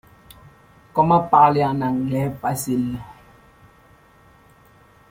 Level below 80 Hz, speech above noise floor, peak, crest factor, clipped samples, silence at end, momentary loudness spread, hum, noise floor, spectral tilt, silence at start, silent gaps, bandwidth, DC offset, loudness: -52 dBFS; 34 dB; -2 dBFS; 20 dB; under 0.1%; 2 s; 12 LU; none; -52 dBFS; -6.5 dB/octave; 0.95 s; none; 16.5 kHz; under 0.1%; -19 LUFS